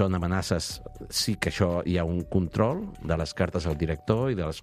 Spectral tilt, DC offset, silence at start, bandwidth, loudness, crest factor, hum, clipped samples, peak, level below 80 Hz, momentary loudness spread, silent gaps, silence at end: -5.5 dB/octave; under 0.1%; 0 s; 15 kHz; -28 LUFS; 20 dB; none; under 0.1%; -6 dBFS; -42 dBFS; 5 LU; none; 0 s